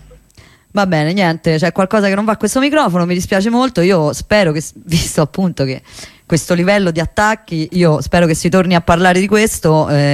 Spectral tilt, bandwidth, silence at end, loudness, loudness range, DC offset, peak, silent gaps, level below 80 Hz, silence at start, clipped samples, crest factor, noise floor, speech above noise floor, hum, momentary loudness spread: -5.5 dB/octave; 15.5 kHz; 0 s; -13 LUFS; 3 LU; under 0.1%; 0 dBFS; none; -36 dBFS; 0.75 s; under 0.1%; 14 dB; -45 dBFS; 32 dB; none; 6 LU